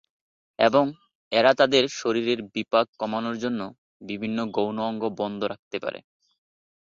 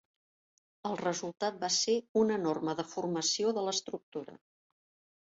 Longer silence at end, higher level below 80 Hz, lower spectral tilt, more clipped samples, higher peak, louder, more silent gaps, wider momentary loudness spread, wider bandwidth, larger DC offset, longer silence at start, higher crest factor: about the same, 0.85 s vs 0.9 s; first, -68 dBFS vs -76 dBFS; first, -4.5 dB/octave vs -3 dB/octave; neither; first, -6 dBFS vs -18 dBFS; first, -25 LUFS vs -32 LUFS; first, 1.15-1.31 s, 2.88-2.93 s, 3.78-4.00 s, 5.59-5.71 s vs 2.09-2.15 s, 4.03-4.12 s; about the same, 12 LU vs 13 LU; about the same, 7.6 kHz vs 8 kHz; neither; second, 0.6 s vs 0.85 s; about the same, 20 dB vs 16 dB